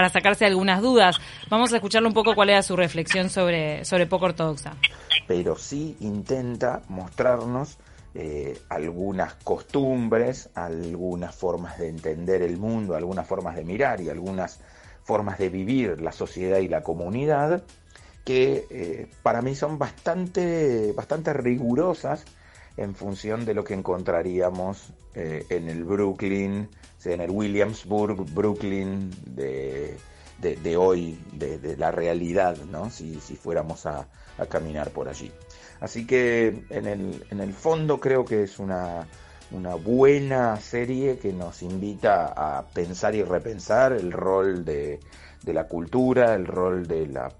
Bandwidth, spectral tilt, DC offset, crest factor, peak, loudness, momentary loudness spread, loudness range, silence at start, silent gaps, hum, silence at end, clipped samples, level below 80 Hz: 11.5 kHz; -5.5 dB/octave; under 0.1%; 22 dB; -2 dBFS; -25 LUFS; 14 LU; 7 LU; 0 s; none; none; 0.05 s; under 0.1%; -50 dBFS